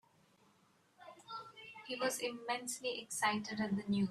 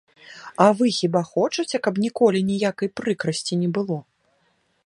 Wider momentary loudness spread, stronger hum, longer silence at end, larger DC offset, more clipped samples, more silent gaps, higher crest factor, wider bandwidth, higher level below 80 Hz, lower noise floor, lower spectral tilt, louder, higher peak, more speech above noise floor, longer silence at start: first, 16 LU vs 9 LU; neither; second, 0 s vs 0.85 s; neither; neither; neither; about the same, 20 dB vs 22 dB; first, 13.5 kHz vs 11.5 kHz; second, -78 dBFS vs -66 dBFS; first, -71 dBFS vs -66 dBFS; second, -3.5 dB/octave vs -5.5 dB/octave; second, -39 LUFS vs -22 LUFS; second, -20 dBFS vs 0 dBFS; second, 33 dB vs 45 dB; first, 1 s vs 0.3 s